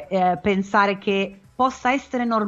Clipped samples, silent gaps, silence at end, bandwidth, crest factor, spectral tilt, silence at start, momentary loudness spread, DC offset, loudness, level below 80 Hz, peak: under 0.1%; none; 0 s; 7.8 kHz; 16 dB; -6 dB/octave; 0 s; 4 LU; under 0.1%; -22 LUFS; -54 dBFS; -4 dBFS